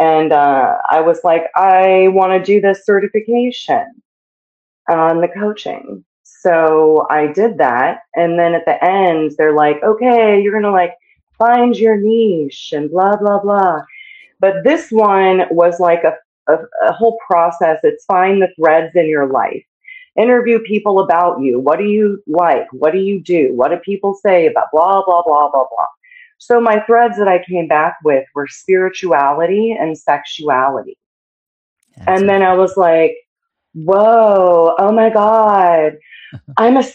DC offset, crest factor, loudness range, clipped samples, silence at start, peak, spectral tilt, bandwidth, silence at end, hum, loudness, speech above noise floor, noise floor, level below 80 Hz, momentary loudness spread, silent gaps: under 0.1%; 12 dB; 4 LU; under 0.1%; 0 s; 0 dBFS; -6.5 dB/octave; 8.2 kHz; 0 s; none; -13 LUFS; 27 dB; -39 dBFS; -62 dBFS; 7 LU; 4.05-4.85 s, 6.06-6.24 s, 11.23-11.27 s, 16.25-16.46 s, 19.68-19.80 s, 25.97-26.01 s, 31.06-31.77 s, 33.27-33.36 s